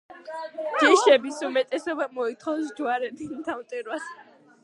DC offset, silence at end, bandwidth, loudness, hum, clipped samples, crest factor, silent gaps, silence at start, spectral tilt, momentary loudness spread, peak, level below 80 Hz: under 0.1%; 0.4 s; 11.5 kHz; -25 LUFS; none; under 0.1%; 22 dB; none; 0.1 s; -2 dB/octave; 17 LU; -4 dBFS; -74 dBFS